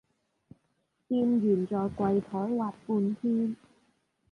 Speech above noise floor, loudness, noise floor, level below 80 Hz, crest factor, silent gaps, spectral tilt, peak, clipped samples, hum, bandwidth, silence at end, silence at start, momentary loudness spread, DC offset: 48 dB; -29 LUFS; -76 dBFS; -64 dBFS; 16 dB; none; -10 dB/octave; -14 dBFS; under 0.1%; none; 5.4 kHz; 0.75 s; 1.1 s; 7 LU; under 0.1%